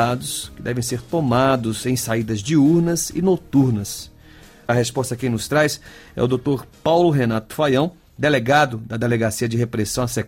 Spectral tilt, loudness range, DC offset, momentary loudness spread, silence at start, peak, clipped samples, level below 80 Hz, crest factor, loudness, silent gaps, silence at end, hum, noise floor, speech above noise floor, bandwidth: -5.5 dB/octave; 3 LU; under 0.1%; 9 LU; 0 s; -6 dBFS; under 0.1%; -48 dBFS; 14 dB; -20 LUFS; none; 0 s; none; -45 dBFS; 26 dB; 16.5 kHz